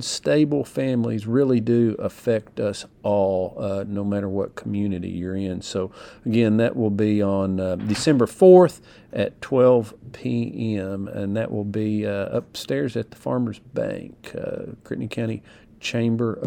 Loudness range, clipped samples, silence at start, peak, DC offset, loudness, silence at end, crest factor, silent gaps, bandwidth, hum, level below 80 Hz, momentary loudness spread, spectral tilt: 9 LU; under 0.1%; 0 s; -2 dBFS; under 0.1%; -22 LUFS; 0 s; 20 dB; none; 15 kHz; none; -56 dBFS; 11 LU; -6.5 dB/octave